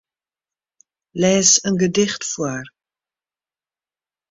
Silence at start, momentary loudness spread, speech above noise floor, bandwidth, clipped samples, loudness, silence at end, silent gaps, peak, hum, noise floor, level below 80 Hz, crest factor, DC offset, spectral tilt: 1.15 s; 15 LU; over 72 dB; 8 kHz; under 0.1%; -17 LUFS; 1.6 s; none; -2 dBFS; none; under -90 dBFS; -58 dBFS; 20 dB; under 0.1%; -3 dB/octave